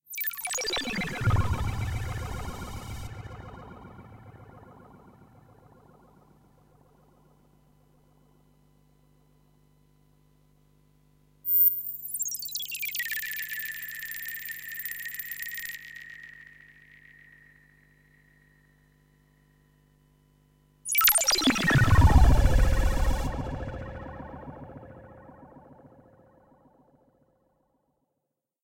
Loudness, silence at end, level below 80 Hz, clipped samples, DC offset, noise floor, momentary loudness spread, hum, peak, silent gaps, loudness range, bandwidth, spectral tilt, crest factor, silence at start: -26 LUFS; 3.05 s; -34 dBFS; under 0.1%; under 0.1%; -83 dBFS; 26 LU; 50 Hz at -60 dBFS; -6 dBFS; none; 23 LU; 17 kHz; -3.5 dB/octave; 24 dB; 0.1 s